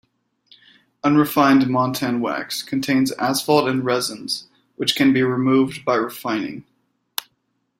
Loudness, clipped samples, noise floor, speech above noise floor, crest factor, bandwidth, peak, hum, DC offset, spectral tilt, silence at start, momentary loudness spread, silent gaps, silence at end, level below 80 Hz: -20 LUFS; under 0.1%; -71 dBFS; 52 dB; 20 dB; 16 kHz; -2 dBFS; none; under 0.1%; -4.5 dB/octave; 1.05 s; 12 LU; none; 1.2 s; -62 dBFS